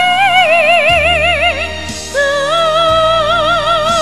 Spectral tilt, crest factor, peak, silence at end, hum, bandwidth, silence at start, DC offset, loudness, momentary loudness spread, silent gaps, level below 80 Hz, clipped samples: -2.5 dB/octave; 12 dB; 0 dBFS; 0 s; none; 14 kHz; 0 s; 2%; -10 LUFS; 8 LU; none; -32 dBFS; under 0.1%